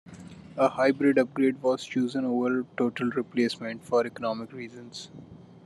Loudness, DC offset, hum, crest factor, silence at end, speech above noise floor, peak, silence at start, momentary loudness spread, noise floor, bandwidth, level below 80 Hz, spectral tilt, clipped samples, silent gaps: -27 LUFS; under 0.1%; none; 18 dB; 0.1 s; 19 dB; -10 dBFS; 0.05 s; 18 LU; -45 dBFS; 11.5 kHz; -72 dBFS; -6 dB/octave; under 0.1%; none